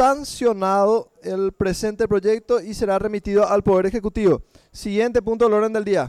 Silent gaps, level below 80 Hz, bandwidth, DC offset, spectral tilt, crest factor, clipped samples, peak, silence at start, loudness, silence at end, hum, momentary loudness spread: none; -42 dBFS; 14 kHz; under 0.1%; -6 dB/octave; 12 dB; under 0.1%; -8 dBFS; 0 s; -20 LUFS; 0 s; none; 6 LU